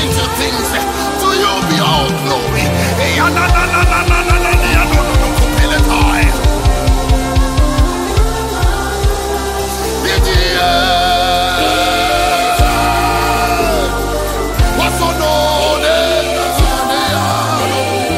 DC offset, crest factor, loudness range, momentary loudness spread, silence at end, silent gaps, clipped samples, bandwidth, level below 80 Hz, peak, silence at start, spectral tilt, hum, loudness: under 0.1%; 12 dB; 3 LU; 5 LU; 0 s; none; under 0.1%; 16.5 kHz; -18 dBFS; 0 dBFS; 0 s; -4 dB/octave; none; -13 LUFS